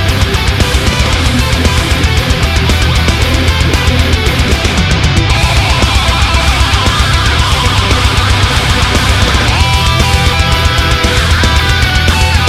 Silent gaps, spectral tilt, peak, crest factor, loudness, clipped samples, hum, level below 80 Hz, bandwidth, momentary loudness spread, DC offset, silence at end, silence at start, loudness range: none; -4 dB/octave; 0 dBFS; 10 dB; -10 LUFS; 0.2%; none; -14 dBFS; 15.5 kHz; 1 LU; under 0.1%; 0 s; 0 s; 1 LU